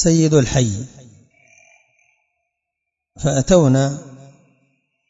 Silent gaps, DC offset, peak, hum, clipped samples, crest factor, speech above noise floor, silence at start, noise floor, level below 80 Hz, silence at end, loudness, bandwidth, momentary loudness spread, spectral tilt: none; under 0.1%; 0 dBFS; none; under 0.1%; 20 dB; 66 dB; 0 s; -81 dBFS; -40 dBFS; 0.95 s; -16 LUFS; 8 kHz; 16 LU; -6 dB/octave